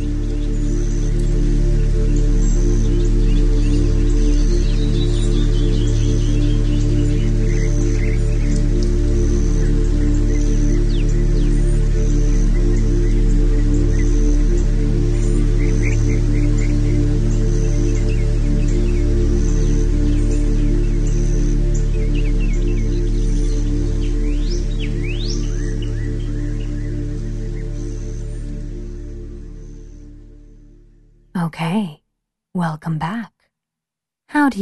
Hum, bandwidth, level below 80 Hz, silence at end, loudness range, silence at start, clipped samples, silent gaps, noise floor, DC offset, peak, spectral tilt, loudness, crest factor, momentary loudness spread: none; 9.2 kHz; -16 dBFS; 0 s; 9 LU; 0 s; under 0.1%; none; -85 dBFS; under 0.1%; -2 dBFS; -7 dB/octave; -20 LUFS; 12 dB; 8 LU